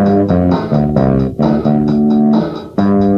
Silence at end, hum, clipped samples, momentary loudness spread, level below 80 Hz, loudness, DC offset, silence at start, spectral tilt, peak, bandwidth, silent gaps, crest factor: 0 s; none; under 0.1%; 3 LU; -32 dBFS; -13 LUFS; under 0.1%; 0 s; -10 dB/octave; 0 dBFS; 6 kHz; none; 12 dB